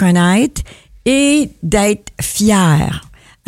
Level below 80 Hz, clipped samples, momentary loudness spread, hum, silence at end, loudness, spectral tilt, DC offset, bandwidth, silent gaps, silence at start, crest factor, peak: -34 dBFS; under 0.1%; 11 LU; none; 0.45 s; -14 LUFS; -5 dB/octave; under 0.1%; 16.5 kHz; none; 0 s; 14 dB; 0 dBFS